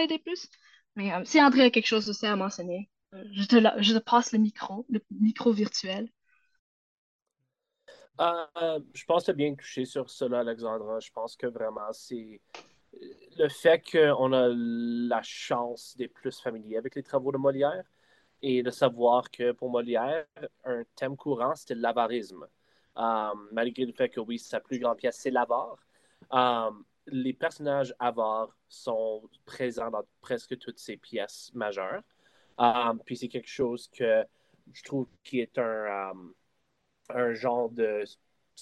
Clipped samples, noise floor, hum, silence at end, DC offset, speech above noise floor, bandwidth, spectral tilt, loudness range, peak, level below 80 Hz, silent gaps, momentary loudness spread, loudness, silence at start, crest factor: under 0.1%; -83 dBFS; none; 0 s; under 0.1%; 54 dB; 12.5 kHz; -5 dB/octave; 8 LU; -6 dBFS; -76 dBFS; 6.59-7.19 s; 16 LU; -29 LUFS; 0 s; 22 dB